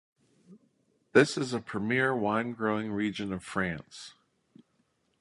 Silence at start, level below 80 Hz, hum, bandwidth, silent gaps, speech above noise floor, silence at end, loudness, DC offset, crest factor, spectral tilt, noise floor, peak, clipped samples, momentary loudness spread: 0.5 s; -64 dBFS; none; 11.5 kHz; none; 44 dB; 1.1 s; -29 LUFS; under 0.1%; 24 dB; -5.5 dB/octave; -73 dBFS; -8 dBFS; under 0.1%; 15 LU